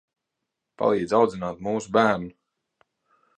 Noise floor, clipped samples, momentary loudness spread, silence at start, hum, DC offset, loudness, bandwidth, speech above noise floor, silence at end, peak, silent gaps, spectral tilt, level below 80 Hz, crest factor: -83 dBFS; under 0.1%; 9 LU; 0.8 s; none; under 0.1%; -24 LUFS; 9.8 kHz; 60 dB; 1.05 s; -6 dBFS; none; -6 dB/octave; -60 dBFS; 20 dB